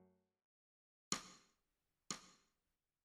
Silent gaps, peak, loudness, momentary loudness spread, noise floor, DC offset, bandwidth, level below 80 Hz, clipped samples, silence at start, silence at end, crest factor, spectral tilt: 0.44-1.11 s; -22 dBFS; -48 LUFS; 22 LU; under -90 dBFS; under 0.1%; 15 kHz; -84 dBFS; under 0.1%; 0 s; 0.7 s; 34 dB; -1.5 dB/octave